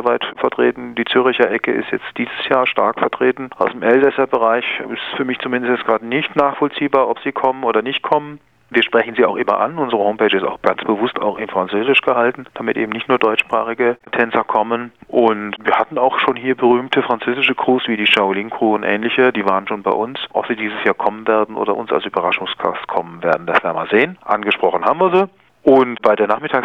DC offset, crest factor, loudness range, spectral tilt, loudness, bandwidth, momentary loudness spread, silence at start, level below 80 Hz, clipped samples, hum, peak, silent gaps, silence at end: under 0.1%; 16 dB; 2 LU; -6.5 dB/octave; -17 LUFS; 8.2 kHz; 7 LU; 0 s; -60 dBFS; under 0.1%; none; 0 dBFS; none; 0 s